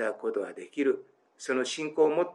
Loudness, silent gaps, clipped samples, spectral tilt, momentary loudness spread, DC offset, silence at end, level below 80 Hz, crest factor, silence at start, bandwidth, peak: -30 LUFS; none; under 0.1%; -3.5 dB/octave; 10 LU; under 0.1%; 0 s; under -90 dBFS; 16 dB; 0 s; 11 kHz; -12 dBFS